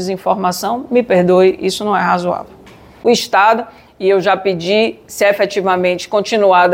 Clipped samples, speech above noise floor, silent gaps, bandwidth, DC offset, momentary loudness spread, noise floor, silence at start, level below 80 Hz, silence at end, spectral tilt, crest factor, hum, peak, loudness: under 0.1%; 27 dB; none; 16.5 kHz; under 0.1%; 8 LU; -40 dBFS; 0 s; -54 dBFS; 0 s; -4.5 dB/octave; 12 dB; none; 0 dBFS; -14 LUFS